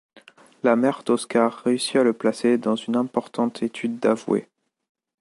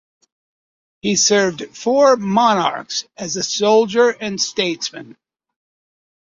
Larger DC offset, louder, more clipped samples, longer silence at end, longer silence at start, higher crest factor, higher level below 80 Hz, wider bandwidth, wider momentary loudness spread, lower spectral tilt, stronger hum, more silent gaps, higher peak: neither; second, -23 LUFS vs -17 LUFS; neither; second, 0.8 s vs 1.2 s; second, 0.65 s vs 1.05 s; about the same, 18 dB vs 18 dB; second, -72 dBFS vs -62 dBFS; first, 11.5 kHz vs 7.8 kHz; second, 6 LU vs 12 LU; first, -5 dB/octave vs -3 dB/octave; neither; neither; about the same, -4 dBFS vs -2 dBFS